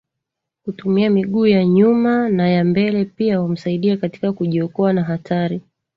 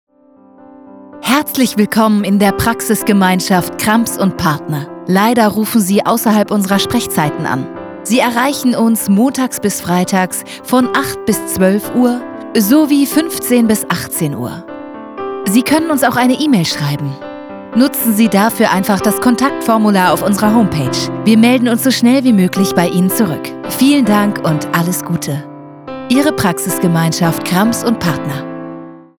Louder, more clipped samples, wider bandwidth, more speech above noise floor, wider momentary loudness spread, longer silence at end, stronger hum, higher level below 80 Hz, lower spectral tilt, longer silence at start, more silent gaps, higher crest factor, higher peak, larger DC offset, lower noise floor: second, -17 LUFS vs -13 LUFS; neither; second, 5.8 kHz vs over 20 kHz; first, 64 dB vs 33 dB; about the same, 9 LU vs 11 LU; first, 0.35 s vs 0.2 s; neither; second, -58 dBFS vs -46 dBFS; first, -9.5 dB/octave vs -5 dB/octave; second, 0.65 s vs 0.95 s; neither; about the same, 14 dB vs 12 dB; second, -4 dBFS vs 0 dBFS; neither; first, -80 dBFS vs -45 dBFS